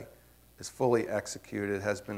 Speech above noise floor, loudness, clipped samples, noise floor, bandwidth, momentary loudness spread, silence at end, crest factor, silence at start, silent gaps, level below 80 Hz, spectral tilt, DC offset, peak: 27 dB; -32 LUFS; under 0.1%; -59 dBFS; 16 kHz; 16 LU; 0 s; 20 dB; 0 s; none; -64 dBFS; -5 dB/octave; under 0.1%; -14 dBFS